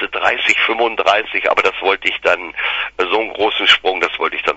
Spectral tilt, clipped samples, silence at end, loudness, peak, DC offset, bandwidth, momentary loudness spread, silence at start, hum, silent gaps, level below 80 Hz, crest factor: -1.5 dB/octave; under 0.1%; 0 s; -15 LUFS; 0 dBFS; under 0.1%; 8.6 kHz; 6 LU; 0 s; none; none; -52 dBFS; 16 dB